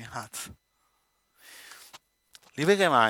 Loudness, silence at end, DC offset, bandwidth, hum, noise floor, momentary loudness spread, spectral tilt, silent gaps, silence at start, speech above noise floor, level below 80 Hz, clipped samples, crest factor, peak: -27 LUFS; 0 s; under 0.1%; 17.5 kHz; none; -73 dBFS; 26 LU; -4 dB/octave; none; 0 s; 48 dB; -68 dBFS; under 0.1%; 22 dB; -6 dBFS